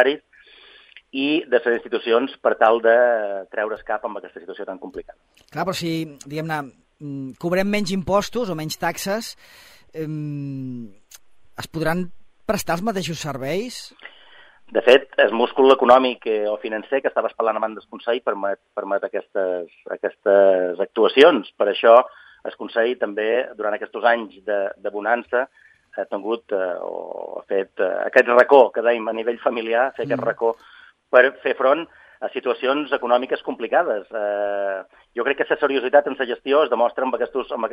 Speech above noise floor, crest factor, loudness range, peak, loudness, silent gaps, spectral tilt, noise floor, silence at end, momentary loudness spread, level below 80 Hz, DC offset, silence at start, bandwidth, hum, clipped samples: 29 dB; 20 dB; 9 LU; 0 dBFS; -20 LUFS; none; -5 dB/octave; -50 dBFS; 0 s; 17 LU; -58 dBFS; under 0.1%; 0 s; 15.5 kHz; none; under 0.1%